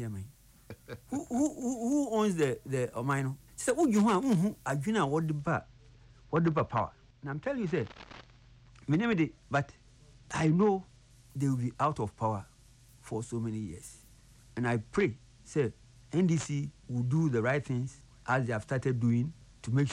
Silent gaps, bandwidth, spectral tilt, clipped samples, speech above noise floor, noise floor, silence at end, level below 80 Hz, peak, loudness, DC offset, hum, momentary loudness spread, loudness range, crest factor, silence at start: none; 15.5 kHz; -6.5 dB/octave; under 0.1%; 28 dB; -58 dBFS; 0 s; -60 dBFS; -16 dBFS; -32 LUFS; under 0.1%; none; 16 LU; 6 LU; 14 dB; 0 s